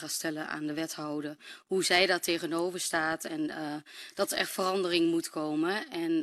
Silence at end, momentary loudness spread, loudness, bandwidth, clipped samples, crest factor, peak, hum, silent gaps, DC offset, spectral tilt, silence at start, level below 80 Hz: 0 s; 12 LU; -30 LUFS; 14 kHz; under 0.1%; 20 dB; -10 dBFS; none; none; under 0.1%; -3 dB/octave; 0 s; -72 dBFS